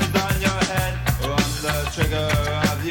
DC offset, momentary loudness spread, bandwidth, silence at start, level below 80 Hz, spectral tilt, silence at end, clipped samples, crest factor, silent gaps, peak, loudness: under 0.1%; 3 LU; 18 kHz; 0 s; -30 dBFS; -4.5 dB/octave; 0 s; under 0.1%; 16 dB; none; -4 dBFS; -22 LUFS